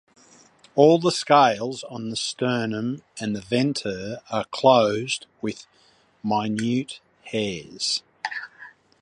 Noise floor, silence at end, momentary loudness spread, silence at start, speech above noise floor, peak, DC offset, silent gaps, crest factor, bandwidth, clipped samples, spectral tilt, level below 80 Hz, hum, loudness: -59 dBFS; 0.3 s; 15 LU; 0.75 s; 37 dB; -2 dBFS; under 0.1%; none; 22 dB; 11.5 kHz; under 0.1%; -4.5 dB/octave; -64 dBFS; none; -23 LUFS